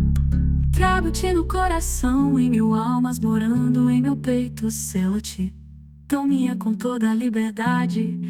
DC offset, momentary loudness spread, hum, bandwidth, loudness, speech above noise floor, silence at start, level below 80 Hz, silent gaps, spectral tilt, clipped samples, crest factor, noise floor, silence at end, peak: under 0.1%; 6 LU; none; 16.5 kHz; -21 LUFS; 22 dB; 0 s; -28 dBFS; none; -6 dB/octave; under 0.1%; 16 dB; -43 dBFS; 0 s; -4 dBFS